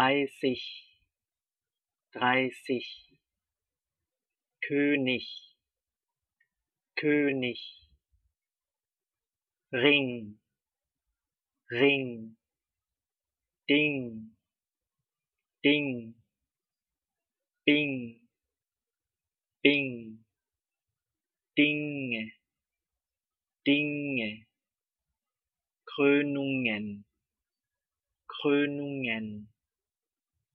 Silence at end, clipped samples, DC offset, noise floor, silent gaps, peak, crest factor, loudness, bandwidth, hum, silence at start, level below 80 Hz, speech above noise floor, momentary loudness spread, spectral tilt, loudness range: 1.1 s; under 0.1%; under 0.1%; under -90 dBFS; none; -4 dBFS; 28 dB; -28 LUFS; 6.4 kHz; none; 0 s; -80 dBFS; over 61 dB; 19 LU; -3 dB/octave; 4 LU